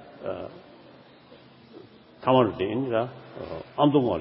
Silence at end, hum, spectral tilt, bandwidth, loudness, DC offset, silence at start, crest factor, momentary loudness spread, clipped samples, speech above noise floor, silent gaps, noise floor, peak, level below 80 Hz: 0 s; none; -11 dB/octave; 5.8 kHz; -26 LUFS; under 0.1%; 0 s; 22 dB; 16 LU; under 0.1%; 27 dB; none; -51 dBFS; -6 dBFS; -58 dBFS